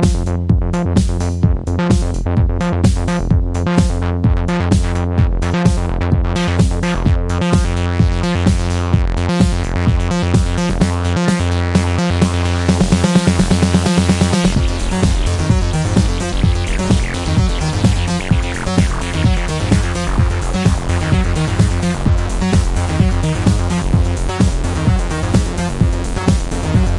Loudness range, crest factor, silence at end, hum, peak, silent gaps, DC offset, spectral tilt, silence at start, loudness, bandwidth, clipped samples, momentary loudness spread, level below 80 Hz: 2 LU; 14 dB; 0 s; none; 0 dBFS; none; under 0.1%; -6 dB/octave; 0 s; -16 LUFS; 11.5 kHz; under 0.1%; 4 LU; -20 dBFS